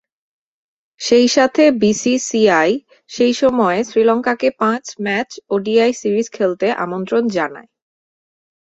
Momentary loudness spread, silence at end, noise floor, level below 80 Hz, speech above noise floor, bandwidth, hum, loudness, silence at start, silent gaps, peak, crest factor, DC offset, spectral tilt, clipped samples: 9 LU; 1.05 s; under -90 dBFS; -58 dBFS; over 75 dB; 8.2 kHz; none; -16 LUFS; 1 s; none; -2 dBFS; 16 dB; under 0.1%; -4 dB/octave; under 0.1%